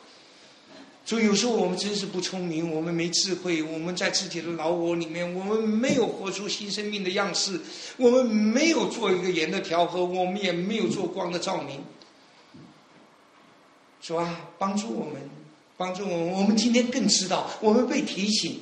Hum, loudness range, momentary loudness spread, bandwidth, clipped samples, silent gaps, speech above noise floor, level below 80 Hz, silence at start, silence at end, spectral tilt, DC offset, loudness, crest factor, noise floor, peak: none; 10 LU; 11 LU; 10.5 kHz; under 0.1%; none; 31 dB; -70 dBFS; 0.7 s; 0 s; -4 dB/octave; under 0.1%; -26 LUFS; 20 dB; -56 dBFS; -8 dBFS